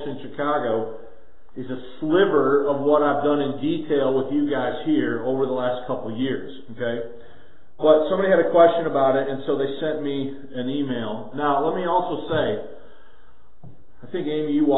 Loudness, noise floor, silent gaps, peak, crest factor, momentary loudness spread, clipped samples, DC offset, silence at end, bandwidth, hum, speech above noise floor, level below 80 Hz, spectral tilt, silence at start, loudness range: -22 LUFS; -55 dBFS; none; -2 dBFS; 20 dB; 14 LU; under 0.1%; 2%; 0 s; 4.1 kHz; none; 34 dB; -58 dBFS; -11 dB/octave; 0 s; 6 LU